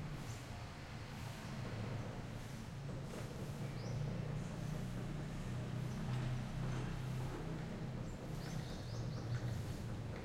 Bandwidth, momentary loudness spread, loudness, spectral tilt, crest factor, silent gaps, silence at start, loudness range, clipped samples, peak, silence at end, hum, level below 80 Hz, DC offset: 16 kHz; 6 LU; -45 LUFS; -6.5 dB/octave; 12 dB; none; 0 s; 3 LU; under 0.1%; -30 dBFS; 0 s; none; -54 dBFS; under 0.1%